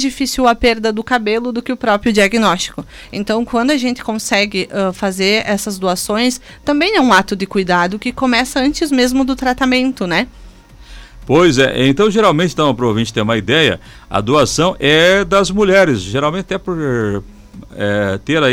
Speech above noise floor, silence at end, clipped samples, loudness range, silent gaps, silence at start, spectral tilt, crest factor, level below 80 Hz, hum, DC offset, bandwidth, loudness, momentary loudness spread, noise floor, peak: 24 dB; 0 s; under 0.1%; 3 LU; none; 0 s; -4.5 dB/octave; 14 dB; -38 dBFS; none; under 0.1%; 17 kHz; -14 LUFS; 9 LU; -38 dBFS; 0 dBFS